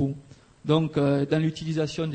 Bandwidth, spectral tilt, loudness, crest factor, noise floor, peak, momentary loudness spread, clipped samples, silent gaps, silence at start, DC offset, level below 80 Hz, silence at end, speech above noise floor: 8.8 kHz; -7 dB/octave; -25 LUFS; 16 dB; -48 dBFS; -10 dBFS; 10 LU; under 0.1%; none; 0 s; under 0.1%; -56 dBFS; 0 s; 24 dB